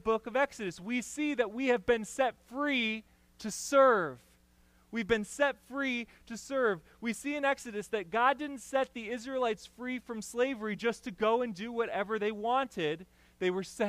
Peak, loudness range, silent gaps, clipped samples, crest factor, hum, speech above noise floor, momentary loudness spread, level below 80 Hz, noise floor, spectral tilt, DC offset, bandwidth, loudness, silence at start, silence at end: -14 dBFS; 3 LU; none; under 0.1%; 20 dB; none; 33 dB; 10 LU; -64 dBFS; -65 dBFS; -4 dB/octave; under 0.1%; 15.5 kHz; -32 LUFS; 0.05 s; 0 s